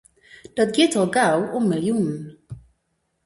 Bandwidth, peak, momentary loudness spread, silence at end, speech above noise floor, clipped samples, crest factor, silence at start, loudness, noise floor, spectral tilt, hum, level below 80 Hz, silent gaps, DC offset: 11.5 kHz; -4 dBFS; 22 LU; 0.7 s; 52 dB; under 0.1%; 18 dB; 0.55 s; -20 LUFS; -72 dBFS; -5 dB/octave; none; -58 dBFS; none; under 0.1%